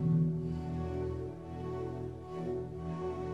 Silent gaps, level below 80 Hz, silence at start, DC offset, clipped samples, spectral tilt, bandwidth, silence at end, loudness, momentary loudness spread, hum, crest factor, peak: none; -52 dBFS; 0 s; under 0.1%; under 0.1%; -10 dB/octave; 6.2 kHz; 0 s; -37 LUFS; 10 LU; none; 16 dB; -20 dBFS